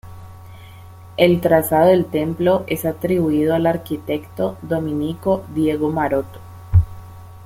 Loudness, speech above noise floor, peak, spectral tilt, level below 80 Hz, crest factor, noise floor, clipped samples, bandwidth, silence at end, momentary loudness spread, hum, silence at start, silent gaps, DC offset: -19 LUFS; 21 dB; 0 dBFS; -7 dB/octave; -38 dBFS; 18 dB; -39 dBFS; under 0.1%; 16.5 kHz; 0 s; 11 LU; none; 0.05 s; none; under 0.1%